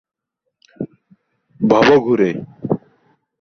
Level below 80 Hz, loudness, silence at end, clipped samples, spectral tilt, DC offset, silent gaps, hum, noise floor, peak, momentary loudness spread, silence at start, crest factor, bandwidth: -54 dBFS; -16 LUFS; 0.65 s; under 0.1%; -6.5 dB/octave; under 0.1%; none; none; -67 dBFS; -2 dBFS; 20 LU; 0.8 s; 18 dB; 6.6 kHz